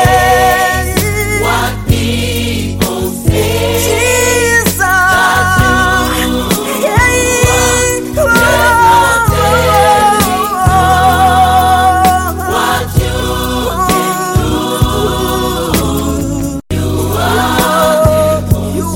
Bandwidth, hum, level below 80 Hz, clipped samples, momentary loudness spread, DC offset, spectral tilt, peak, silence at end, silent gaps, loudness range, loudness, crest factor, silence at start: 17 kHz; none; -22 dBFS; under 0.1%; 7 LU; under 0.1%; -4 dB/octave; 0 dBFS; 0 s; none; 5 LU; -10 LUFS; 10 dB; 0 s